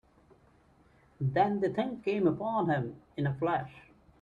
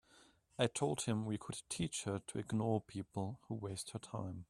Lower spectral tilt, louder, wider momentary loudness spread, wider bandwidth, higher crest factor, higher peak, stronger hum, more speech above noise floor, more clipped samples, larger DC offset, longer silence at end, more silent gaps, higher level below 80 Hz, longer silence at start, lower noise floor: first, -9 dB/octave vs -5 dB/octave; first, -31 LUFS vs -41 LUFS; about the same, 7 LU vs 8 LU; second, 7.2 kHz vs 13.5 kHz; about the same, 18 dB vs 22 dB; first, -14 dBFS vs -18 dBFS; neither; first, 33 dB vs 28 dB; neither; neither; first, 0.4 s vs 0.05 s; neither; about the same, -64 dBFS vs -68 dBFS; first, 1.2 s vs 0.15 s; second, -63 dBFS vs -68 dBFS